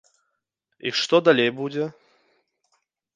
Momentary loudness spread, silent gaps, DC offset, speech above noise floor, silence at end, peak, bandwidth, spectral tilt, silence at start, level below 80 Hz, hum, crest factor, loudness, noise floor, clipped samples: 14 LU; none; under 0.1%; 57 dB; 1.25 s; -4 dBFS; 9.6 kHz; -4.5 dB/octave; 0.85 s; -72 dBFS; none; 22 dB; -22 LUFS; -78 dBFS; under 0.1%